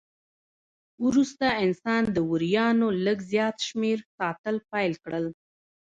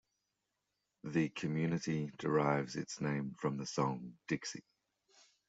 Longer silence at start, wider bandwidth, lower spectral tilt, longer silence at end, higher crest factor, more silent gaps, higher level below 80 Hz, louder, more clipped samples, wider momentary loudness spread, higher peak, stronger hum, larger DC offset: about the same, 1 s vs 1.05 s; about the same, 7.8 kHz vs 8 kHz; about the same, -5.5 dB/octave vs -6 dB/octave; second, 0.6 s vs 0.9 s; about the same, 16 dB vs 20 dB; first, 4.05-4.18 s, 4.39-4.44 s vs none; first, -62 dBFS vs -74 dBFS; first, -26 LUFS vs -37 LUFS; neither; about the same, 8 LU vs 9 LU; first, -12 dBFS vs -20 dBFS; neither; neither